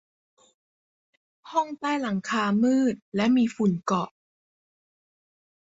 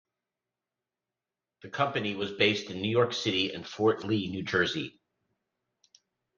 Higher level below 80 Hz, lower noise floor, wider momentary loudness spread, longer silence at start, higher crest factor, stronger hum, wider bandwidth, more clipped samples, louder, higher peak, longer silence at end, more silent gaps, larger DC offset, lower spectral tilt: about the same, -68 dBFS vs -72 dBFS; about the same, under -90 dBFS vs under -90 dBFS; about the same, 6 LU vs 7 LU; second, 1.45 s vs 1.65 s; second, 16 dB vs 24 dB; neither; about the same, 7.8 kHz vs 7.4 kHz; neither; first, -25 LUFS vs -29 LUFS; about the same, -10 dBFS vs -8 dBFS; about the same, 1.6 s vs 1.5 s; first, 3.02-3.12 s vs none; neither; about the same, -6 dB/octave vs -5 dB/octave